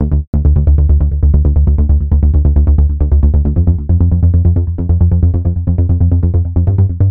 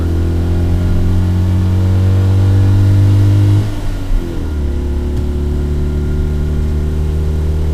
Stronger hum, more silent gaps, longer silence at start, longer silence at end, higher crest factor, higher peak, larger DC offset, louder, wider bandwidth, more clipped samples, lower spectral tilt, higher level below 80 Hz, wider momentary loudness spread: neither; first, 0.27-0.33 s vs none; about the same, 0 s vs 0 s; about the same, 0 s vs 0 s; about the same, 8 dB vs 10 dB; about the same, 0 dBFS vs 0 dBFS; neither; about the same, -12 LUFS vs -14 LUFS; second, 1.6 kHz vs 9 kHz; neither; first, -15 dB/octave vs -8.5 dB/octave; first, -12 dBFS vs -18 dBFS; second, 3 LU vs 9 LU